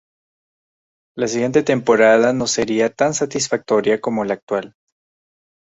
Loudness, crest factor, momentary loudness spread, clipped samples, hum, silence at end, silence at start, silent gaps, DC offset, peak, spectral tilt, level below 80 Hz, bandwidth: -18 LUFS; 18 dB; 11 LU; under 0.1%; none; 0.95 s; 1.15 s; 4.43-4.47 s; under 0.1%; -2 dBFS; -4 dB/octave; -56 dBFS; 8.2 kHz